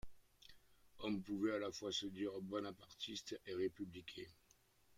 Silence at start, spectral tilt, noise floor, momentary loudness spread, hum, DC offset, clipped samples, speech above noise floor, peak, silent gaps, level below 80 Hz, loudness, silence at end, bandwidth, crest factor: 0.05 s; -4.5 dB/octave; -73 dBFS; 18 LU; none; under 0.1%; under 0.1%; 28 dB; -30 dBFS; none; -72 dBFS; -46 LUFS; 0 s; 16 kHz; 18 dB